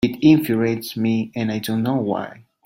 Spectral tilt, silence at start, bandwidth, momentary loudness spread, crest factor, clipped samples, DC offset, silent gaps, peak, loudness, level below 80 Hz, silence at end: -6.5 dB/octave; 0 s; 16.5 kHz; 10 LU; 18 dB; under 0.1%; under 0.1%; none; -2 dBFS; -20 LUFS; -54 dBFS; 0.35 s